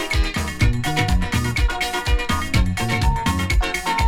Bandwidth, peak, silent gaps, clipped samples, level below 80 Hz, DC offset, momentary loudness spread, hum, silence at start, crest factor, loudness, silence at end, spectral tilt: 17.5 kHz; -4 dBFS; none; under 0.1%; -24 dBFS; under 0.1%; 2 LU; none; 0 s; 16 dB; -21 LUFS; 0 s; -4.5 dB/octave